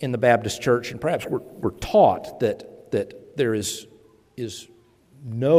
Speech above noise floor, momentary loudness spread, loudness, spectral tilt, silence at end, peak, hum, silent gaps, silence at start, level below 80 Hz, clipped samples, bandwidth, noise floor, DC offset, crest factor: 32 dB; 17 LU; -23 LUFS; -5.5 dB/octave; 0 s; -4 dBFS; none; none; 0 s; -52 dBFS; under 0.1%; 16 kHz; -54 dBFS; under 0.1%; 18 dB